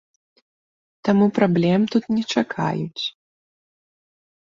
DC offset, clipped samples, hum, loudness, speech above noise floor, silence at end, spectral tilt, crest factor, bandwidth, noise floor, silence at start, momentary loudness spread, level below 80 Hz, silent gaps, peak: under 0.1%; under 0.1%; none; -21 LUFS; over 70 dB; 1.3 s; -6.5 dB/octave; 20 dB; 7.4 kHz; under -90 dBFS; 1.05 s; 10 LU; -62 dBFS; none; -4 dBFS